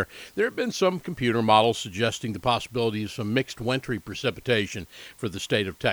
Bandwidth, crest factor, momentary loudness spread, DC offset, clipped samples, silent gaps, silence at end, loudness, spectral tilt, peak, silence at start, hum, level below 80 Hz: over 20 kHz; 22 dB; 12 LU; under 0.1%; under 0.1%; none; 0 s; -26 LUFS; -5 dB/octave; -4 dBFS; 0 s; none; -54 dBFS